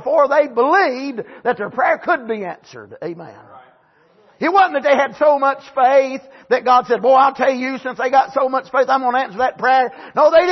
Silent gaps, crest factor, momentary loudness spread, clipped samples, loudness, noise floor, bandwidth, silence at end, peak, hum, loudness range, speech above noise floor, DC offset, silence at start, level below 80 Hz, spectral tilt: none; 14 dB; 12 LU; under 0.1%; -16 LUFS; -54 dBFS; 6.2 kHz; 0 s; -2 dBFS; none; 7 LU; 38 dB; under 0.1%; 0 s; -64 dBFS; -4.5 dB/octave